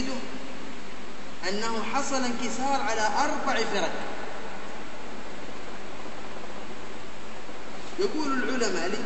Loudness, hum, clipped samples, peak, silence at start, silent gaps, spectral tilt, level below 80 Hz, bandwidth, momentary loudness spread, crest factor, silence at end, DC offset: -31 LUFS; none; under 0.1%; -12 dBFS; 0 s; none; -3 dB/octave; -56 dBFS; 8.4 kHz; 14 LU; 20 dB; 0 s; 5%